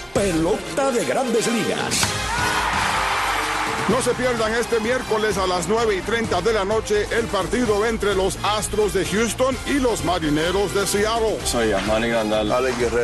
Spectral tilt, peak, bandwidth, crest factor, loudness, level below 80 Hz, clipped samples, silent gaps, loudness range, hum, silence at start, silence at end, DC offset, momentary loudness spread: -3.5 dB/octave; -6 dBFS; 12.5 kHz; 16 dB; -21 LUFS; -36 dBFS; under 0.1%; none; 0 LU; none; 0 s; 0 s; under 0.1%; 2 LU